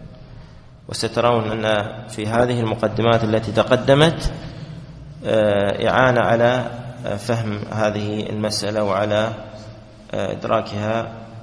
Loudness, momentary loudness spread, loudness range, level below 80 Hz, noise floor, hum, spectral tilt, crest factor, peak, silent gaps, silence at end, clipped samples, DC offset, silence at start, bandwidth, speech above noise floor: -20 LUFS; 16 LU; 5 LU; -40 dBFS; -42 dBFS; none; -5.5 dB/octave; 20 dB; 0 dBFS; none; 0 s; under 0.1%; under 0.1%; 0 s; 11 kHz; 23 dB